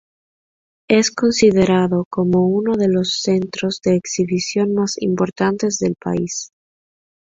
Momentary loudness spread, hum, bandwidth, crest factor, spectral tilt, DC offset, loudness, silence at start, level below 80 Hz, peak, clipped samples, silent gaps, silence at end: 7 LU; none; 7.8 kHz; 16 dB; -5 dB/octave; under 0.1%; -18 LUFS; 0.9 s; -52 dBFS; -2 dBFS; under 0.1%; 2.05-2.11 s; 0.9 s